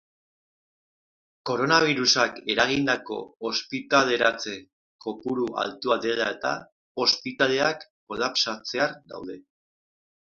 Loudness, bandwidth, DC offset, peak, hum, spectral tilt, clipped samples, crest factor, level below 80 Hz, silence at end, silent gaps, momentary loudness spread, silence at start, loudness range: -24 LUFS; 7.6 kHz; under 0.1%; -2 dBFS; none; -3 dB/octave; under 0.1%; 24 dB; -64 dBFS; 0.9 s; 4.73-4.99 s, 6.72-6.95 s, 7.90-8.07 s; 17 LU; 1.45 s; 4 LU